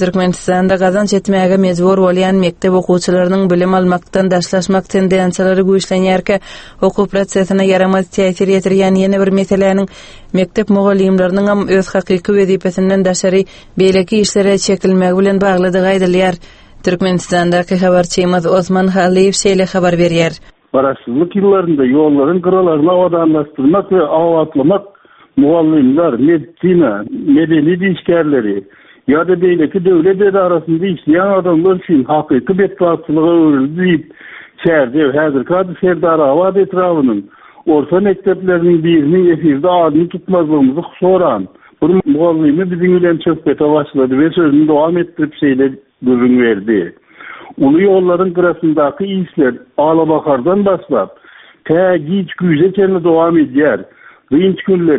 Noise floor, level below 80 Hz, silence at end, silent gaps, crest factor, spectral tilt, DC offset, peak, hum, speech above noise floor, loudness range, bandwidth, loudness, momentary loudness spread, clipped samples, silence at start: -33 dBFS; -44 dBFS; 0 s; none; 12 dB; -6.5 dB/octave; under 0.1%; 0 dBFS; none; 22 dB; 1 LU; 8.8 kHz; -12 LUFS; 5 LU; under 0.1%; 0 s